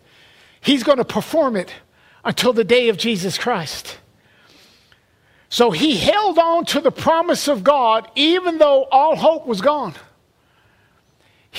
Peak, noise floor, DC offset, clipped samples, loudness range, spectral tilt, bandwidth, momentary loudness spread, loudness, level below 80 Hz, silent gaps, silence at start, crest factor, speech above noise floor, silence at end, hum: -2 dBFS; -58 dBFS; under 0.1%; under 0.1%; 5 LU; -4 dB/octave; 16 kHz; 10 LU; -17 LUFS; -54 dBFS; none; 0.65 s; 18 dB; 42 dB; 0 s; none